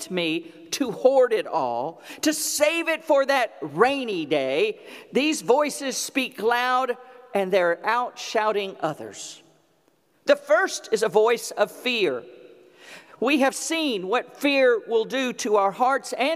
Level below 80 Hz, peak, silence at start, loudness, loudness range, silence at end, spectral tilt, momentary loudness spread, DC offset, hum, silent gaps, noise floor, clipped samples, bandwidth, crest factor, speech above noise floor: -76 dBFS; -4 dBFS; 0 s; -23 LUFS; 3 LU; 0 s; -3 dB/octave; 9 LU; under 0.1%; none; none; -64 dBFS; under 0.1%; 16 kHz; 20 dB; 41 dB